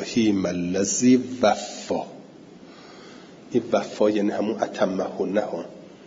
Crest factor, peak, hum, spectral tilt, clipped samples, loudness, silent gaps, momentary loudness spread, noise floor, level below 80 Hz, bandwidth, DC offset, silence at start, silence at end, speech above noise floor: 18 dB; -6 dBFS; none; -4.5 dB/octave; under 0.1%; -24 LUFS; none; 24 LU; -45 dBFS; -64 dBFS; 7.8 kHz; under 0.1%; 0 s; 0 s; 23 dB